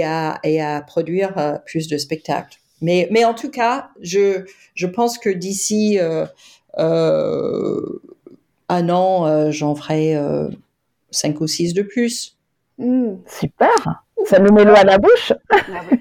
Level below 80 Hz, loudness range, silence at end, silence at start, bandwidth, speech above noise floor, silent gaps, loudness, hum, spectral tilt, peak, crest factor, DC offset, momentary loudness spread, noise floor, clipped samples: -52 dBFS; 7 LU; 0 s; 0 s; 17 kHz; 31 dB; none; -17 LUFS; none; -5 dB/octave; 0 dBFS; 18 dB; under 0.1%; 13 LU; -47 dBFS; under 0.1%